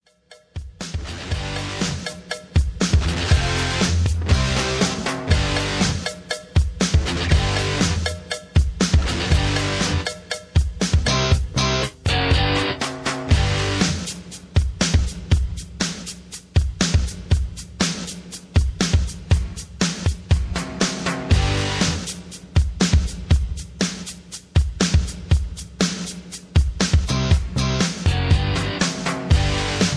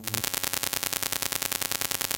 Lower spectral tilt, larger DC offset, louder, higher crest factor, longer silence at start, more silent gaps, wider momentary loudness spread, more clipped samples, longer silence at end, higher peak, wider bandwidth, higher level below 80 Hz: first, -4.5 dB/octave vs -0.5 dB/octave; neither; first, -21 LUFS vs -27 LUFS; second, 18 dB vs 28 dB; first, 0.3 s vs 0 s; neither; first, 11 LU vs 0 LU; neither; about the same, 0 s vs 0 s; about the same, -4 dBFS vs -2 dBFS; second, 11 kHz vs 17.5 kHz; first, -26 dBFS vs -58 dBFS